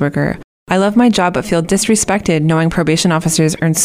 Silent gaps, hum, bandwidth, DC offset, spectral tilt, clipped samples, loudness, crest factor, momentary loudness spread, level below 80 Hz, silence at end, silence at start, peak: 0.44-0.66 s; none; 16 kHz; under 0.1%; -4.5 dB/octave; under 0.1%; -13 LUFS; 12 dB; 6 LU; -40 dBFS; 0 s; 0 s; 0 dBFS